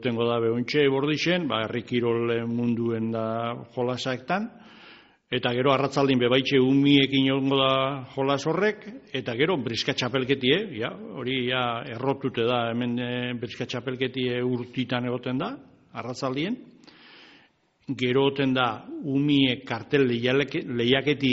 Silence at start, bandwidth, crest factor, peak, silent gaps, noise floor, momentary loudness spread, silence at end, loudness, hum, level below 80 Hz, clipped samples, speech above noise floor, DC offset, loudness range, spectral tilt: 0 s; 7.6 kHz; 20 dB; -6 dBFS; none; -62 dBFS; 10 LU; 0 s; -25 LUFS; none; -64 dBFS; under 0.1%; 37 dB; under 0.1%; 7 LU; -4 dB/octave